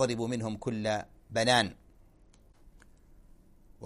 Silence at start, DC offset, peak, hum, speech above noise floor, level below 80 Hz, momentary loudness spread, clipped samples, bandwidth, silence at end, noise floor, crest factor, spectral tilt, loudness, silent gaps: 0 s; under 0.1%; -10 dBFS; none; 29 dB; -58 dBFS; 10 LU; under 0.1%; 15 kHz; 0 s; -59 dBFS; 24 dB; -4 dB/octave; -30 LUFS; none